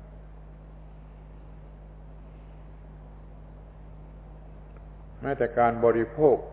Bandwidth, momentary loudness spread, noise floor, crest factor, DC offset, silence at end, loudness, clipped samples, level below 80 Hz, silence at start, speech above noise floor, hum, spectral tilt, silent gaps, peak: 4 kHz; 25 LU; -45 dBFS; 22 dB; under 0.1%; 0 s; -25 LUFS; under 0.1%; -46 dBFS; 0 s; 22 dB; 50 Hz at -50 dBFS; -11 dB/octave; none; -8 dBFS